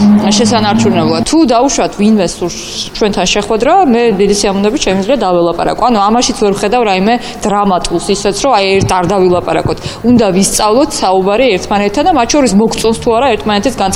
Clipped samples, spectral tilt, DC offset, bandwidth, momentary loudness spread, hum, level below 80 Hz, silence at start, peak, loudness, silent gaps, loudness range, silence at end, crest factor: under 0.1%; -4.5 dB/octave; under 0.1%; 16 kHz; 5 LU; none; -32 dBFS; 0 s; 0 dBFS; -10 LUFS; none; 1 LU; 0 s; 10 dB